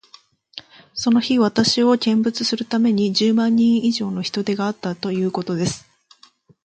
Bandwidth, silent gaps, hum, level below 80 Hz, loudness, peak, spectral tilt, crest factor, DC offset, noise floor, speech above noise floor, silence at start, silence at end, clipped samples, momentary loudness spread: 9 kHz; none; none; -60 dBFS; -19 LUFS; -4 dBFS; -5 dB/octave; 16 dB; under 0.1%; -53 dBFS; 35 dB; 0.55 s; 0.85 s; under 0.1%; 13 LU